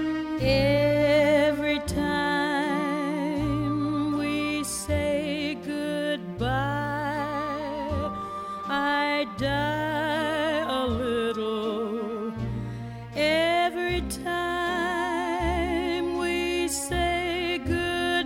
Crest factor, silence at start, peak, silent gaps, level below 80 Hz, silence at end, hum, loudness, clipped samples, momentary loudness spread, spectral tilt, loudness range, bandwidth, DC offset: 16 dB; 0 s; -10 dBFS; none; -44 dBFS; 0 s; none; -26 LUFS; under 0.1%; 8 LU; -5 dB/octave; 4 LU; 16 kHz; under 0.1%